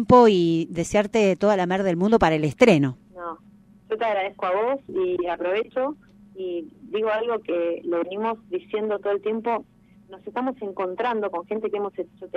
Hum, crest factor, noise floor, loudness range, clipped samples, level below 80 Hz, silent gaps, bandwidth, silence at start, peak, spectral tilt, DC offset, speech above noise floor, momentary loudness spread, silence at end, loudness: none; 20 dB; -52 dBFS; 7 LU; under 0.1%; -52 dBFS; none; 11.5 kHz; 0 s; -2 dBFS; -6.5 dB/octave; under 0.1%; 30 dB; 14 LU; 0 s; -23 LUFS